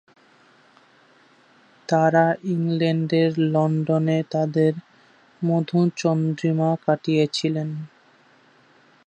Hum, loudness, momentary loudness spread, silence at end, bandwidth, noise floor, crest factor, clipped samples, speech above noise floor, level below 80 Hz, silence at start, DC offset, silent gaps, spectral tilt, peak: none; -22 LUFS; 8 LU; 1.2 s; 8.8 kHz; -56 dBFS; 18 dB; under 0.1%; 35 dB; -70 dBFS; 1.9 s; under 0.1%; none; -7 dB/octave; -4 dBFS